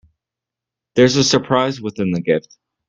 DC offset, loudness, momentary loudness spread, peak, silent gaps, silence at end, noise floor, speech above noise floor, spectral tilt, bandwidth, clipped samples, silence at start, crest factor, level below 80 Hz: under 0.1%; -17 LUFS; 9 LU; 0 dBFS; none; 0.5 s; -86 dBFS; 69 dB; -4.5 dB/octave; 8.8 kHz; under 0.1%; 0.95 s; 18 dB; -54 dBFS